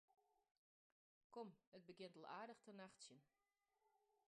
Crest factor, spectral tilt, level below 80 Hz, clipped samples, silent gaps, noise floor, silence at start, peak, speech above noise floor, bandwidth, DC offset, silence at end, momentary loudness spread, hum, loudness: 20 dB; -4 dB/octave; under -90 dBFS; under 0.1%; 0.57-1.30 s, 1.67-1.72 s; -88 dBFS; 0.1 s; -42 dBFS; 28 dB; 10 kHz; under 0.1%; 0.35 s; 8 LU; none; -61 LUFS